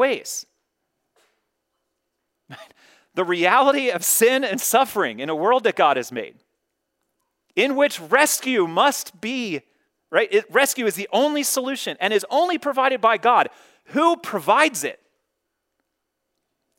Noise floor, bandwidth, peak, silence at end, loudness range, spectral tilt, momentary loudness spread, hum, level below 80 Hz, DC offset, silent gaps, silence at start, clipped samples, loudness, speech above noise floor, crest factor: -78 dBFS; 16.5 kHz; -2 dBFS; 1.85 s; 4 LU; -2 dB/octave; 11 LU; none; -78 dBFS; under 0.1%; none; 0 s; under 0.1%; -20 LUFS; 58 dB; 20 dB